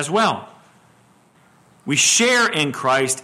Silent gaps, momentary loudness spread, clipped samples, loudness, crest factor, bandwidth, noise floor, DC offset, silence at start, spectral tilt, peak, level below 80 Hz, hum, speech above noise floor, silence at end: none; 11 LU; under 0.1%; -16 LUFS; 16 dB; 16 kHz; -54 dBFS; under 0.1%; 0 s; -2 dB/octave; -4 dBFS; -66 dBFS; none; 36 dB; 0 s